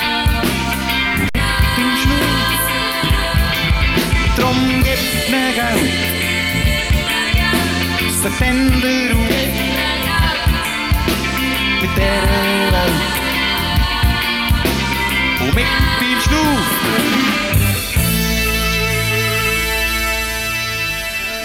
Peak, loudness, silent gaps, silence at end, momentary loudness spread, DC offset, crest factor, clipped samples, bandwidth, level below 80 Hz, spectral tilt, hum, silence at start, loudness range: -2 dBFS; -15 LUFS; none; 0 s; 3 LU; under 0.1%; 14 dB; under 0.1%; 17 kHz; -22 dBFS; -4 dB/octave; none; 0 s; 1 LU